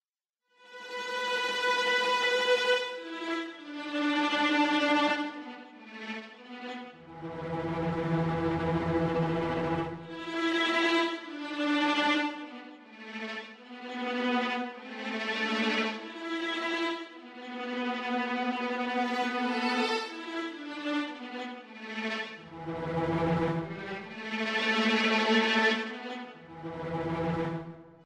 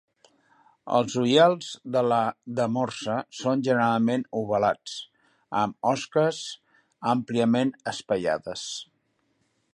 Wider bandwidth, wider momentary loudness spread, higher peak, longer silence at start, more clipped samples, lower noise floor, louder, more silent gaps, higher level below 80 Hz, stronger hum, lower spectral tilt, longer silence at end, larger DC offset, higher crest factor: first, 13 kHz vs 11.5 kHz; first, 16 LU vs 12 LU; second, -14 dBFS vs -6 dBFS; second, 0.6 s vs 0.85 s; neither; first, -87 dBFS vs -72 dBFS; second, -30 LUFS vs -25 LUFS; neither; first, -62 dBFS vs -68 dBFS; neither; about the same, -5 dB/octave vs -5 dB/octave; second, 0 s vs 0.9 s; neither; about the same, 18 dB vs 20 dB